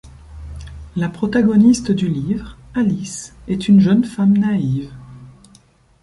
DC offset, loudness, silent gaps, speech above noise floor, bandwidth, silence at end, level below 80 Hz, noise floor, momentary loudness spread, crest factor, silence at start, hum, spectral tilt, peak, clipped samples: under 0.1%; -17 LUFS; none; 36 dB; 11.5 kHz; 0.75 s; -40 dBFS; -51 dBFS; 22 LU; 14 dB; 0.05 s; none; -7 dB/octave; -2 dBFS; under 0.1%